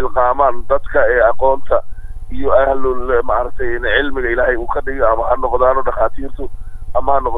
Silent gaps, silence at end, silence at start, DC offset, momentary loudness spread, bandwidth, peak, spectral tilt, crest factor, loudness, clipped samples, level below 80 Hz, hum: none; 0 s; 0 s; under 0.1%; 15 LU; 3.9 kHz; 0 dBFS; -7.5 dB/octave; 12 dB; -16 LUFS; under 0.1%; -26 dBFS; none